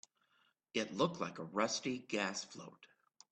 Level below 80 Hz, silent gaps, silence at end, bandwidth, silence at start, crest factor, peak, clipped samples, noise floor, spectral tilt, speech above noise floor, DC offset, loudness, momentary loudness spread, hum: -80 dBFS; none; 0.45 s; 9 kHz; 0.75 s; 22 dB; -20 dBFS; under 0.1%; -77 dBFS; -3.5 dB/octave; 37 dB; under 0.1%; -39 LUFS; 13 LU; none